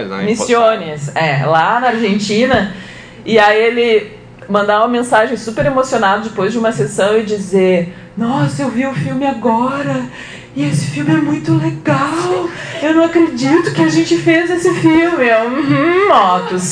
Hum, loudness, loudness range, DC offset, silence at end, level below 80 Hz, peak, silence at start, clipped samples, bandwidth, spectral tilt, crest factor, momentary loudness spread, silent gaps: none; -13 LUFS; 4 LU; under 0.1%; 0 s; -46 dBFS; 0 dBFS; 0 s; under 0.1%; 10 kHz; -5.5 dB/octave; 14 dB; 8 LU; none